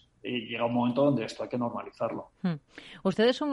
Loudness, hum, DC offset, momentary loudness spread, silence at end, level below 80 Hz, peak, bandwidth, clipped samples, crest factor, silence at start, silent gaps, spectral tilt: -30 LUFS; none; under 0.1%; 9 LU; 0 s; -68 dBFS; -12 dBFS; 11 kHz; under 0.1%; 18 dB; 0.25 s; none; -6.5 dB/octave